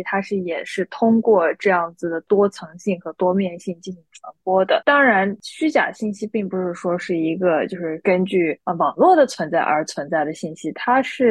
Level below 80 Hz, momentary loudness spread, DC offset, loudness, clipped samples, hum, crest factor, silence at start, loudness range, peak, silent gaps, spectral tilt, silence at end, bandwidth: -68 dBFS; 12 LU; under 0.1%; -20 LUFS; under 0.1%; none; 16 dB; 0 s; 3 LU; -4 dBFS; none; -6 dB/octave; 0 s; 12 kHz